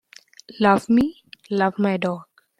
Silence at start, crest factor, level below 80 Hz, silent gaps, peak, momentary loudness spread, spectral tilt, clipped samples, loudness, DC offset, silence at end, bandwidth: 0.5 s; 20 dB; -56 dBFS; none; -2 dBFS; 10 LU; -7 dB/octave; under 0.1%; -21 LUFS; under 0.1%; 0.35 s; 13 kHz